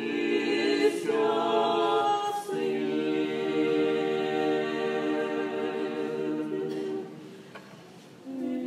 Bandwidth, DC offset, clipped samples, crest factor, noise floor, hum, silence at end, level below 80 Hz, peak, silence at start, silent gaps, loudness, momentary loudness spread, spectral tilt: 14 kHz; under 0.1%; under 0.1%; 16 dB; -49 dBFS; none; 0 s; -84 dBFS; -12 dBFS; 0 s; none; -28 LUFS; 16 LU; -5 dB/octave